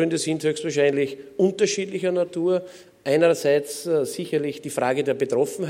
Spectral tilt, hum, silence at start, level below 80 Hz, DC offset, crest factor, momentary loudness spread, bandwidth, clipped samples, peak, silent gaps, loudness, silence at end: -4.5 dB/octave; none; 0 s; -72 dBFS; under 0.1%; 16 dB; 6 LU; 16.5 kHz; under 0.1%; -6 dBFS; none; -23 LUFS; 0 s